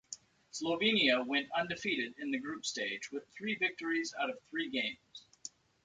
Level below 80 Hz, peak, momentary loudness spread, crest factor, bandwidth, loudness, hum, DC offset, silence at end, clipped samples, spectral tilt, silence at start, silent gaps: -76 dBFS; -16 dBFS; 20 LU; 20 dB; 9.4 kHz; -34 LUFS; none; under 0.1%; 0.35 s; under 0.1%; -2.5 dB/octave; 0.1 s; none